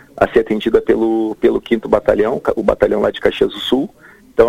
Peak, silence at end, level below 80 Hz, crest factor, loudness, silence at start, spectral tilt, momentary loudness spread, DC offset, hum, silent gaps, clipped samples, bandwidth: 0 dBFS; 0 s; -38 dBFS; 14 dB; -16 LUFS; 0.15 s; -6.5 dB/octave; 4 LU; under 0.1%; none; none; under 0.1%; 15 kHz